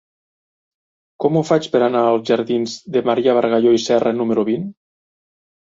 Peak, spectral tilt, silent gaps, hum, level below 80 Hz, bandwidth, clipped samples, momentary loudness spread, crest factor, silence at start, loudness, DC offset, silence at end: -2 dBFS; -6 dB/octave; none; none; -62 dBFS; 7.8 kHz; under 0.1%; 7 LU; 16 dB; 1.2 s; -17 LUFS; under 0.1%; 0.95 s